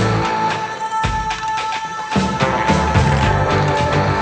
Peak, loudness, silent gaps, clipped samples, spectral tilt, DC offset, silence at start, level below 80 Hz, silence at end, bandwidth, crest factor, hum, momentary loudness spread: 0 dBFS; -17 LUFS; none; under 0.1%; -5.5 dB/octave; under 0.1%; 0 s; -30 dBFS; 0 s; 9.4 kHz; 16 dB; none; 6 LU